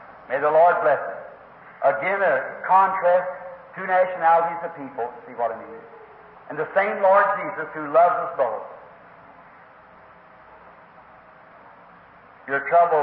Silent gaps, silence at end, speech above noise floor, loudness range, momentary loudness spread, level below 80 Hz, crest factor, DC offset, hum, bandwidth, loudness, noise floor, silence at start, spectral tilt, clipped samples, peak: none; 0 s; 28 dB; 6 LU; 19 LU; -70 dBFS; 18 dB; under 0.1%; none; 4.7 kHz; -21 LUFS; -49 dBFS; 0 s; -9 dB/octave; under 0.1%; -6 dBFS